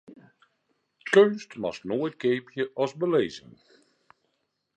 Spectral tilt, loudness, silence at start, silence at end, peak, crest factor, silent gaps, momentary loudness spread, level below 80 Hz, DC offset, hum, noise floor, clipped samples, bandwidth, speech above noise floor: -5.5 dB/octave; -26 LUFS; 1.05 s; 1.4 s; -6 dBFS; 22 dB; none; 14 LU; -70 dBFS; under 0.1%; none; -77 dBFS; under 0.1%; 9.4 kHz; 52 dB